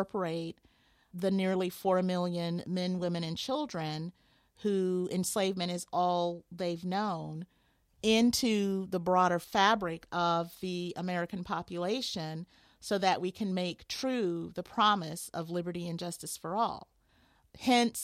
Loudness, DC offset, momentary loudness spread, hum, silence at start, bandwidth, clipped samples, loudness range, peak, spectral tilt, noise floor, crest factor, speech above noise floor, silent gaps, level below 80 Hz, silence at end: -32 LUFS; under 0.1%; 11 LU; none; 0 s; 16 kHz; under 0.1%; 5 LU; -10 dBFS; -4.5 dB/octave; -67 dBFS; 22 dB; 36 dB; none; -66 dBFS; 0 s